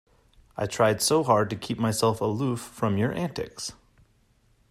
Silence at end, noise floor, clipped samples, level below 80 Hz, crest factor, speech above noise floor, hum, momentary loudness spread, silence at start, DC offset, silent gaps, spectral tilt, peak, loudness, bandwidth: 1 s; -64 dBFS; under 0.1%; -58 dBFS; 18 dB; 38 dB; none; 12 LU; 0.55 s; under 0.1%; none; -5 dB/octave; -8 dBFS; -26 LUFS; 14.5 kHz